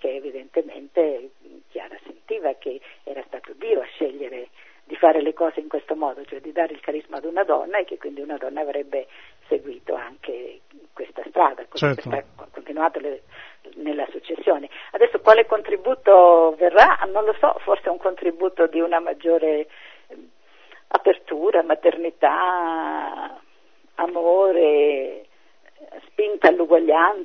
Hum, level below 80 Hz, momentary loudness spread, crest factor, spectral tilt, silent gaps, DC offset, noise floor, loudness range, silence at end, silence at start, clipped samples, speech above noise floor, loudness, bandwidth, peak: none; -64 dBFS; 20 LU; 20 dB; -6.5 dB/octave; none; 0.2%; -59 dBFS; 13 LU; 0 s; 0.05 s; under 0.1%; 40 dB; -20 LUFS; 6.4 kHz; 0 dBFS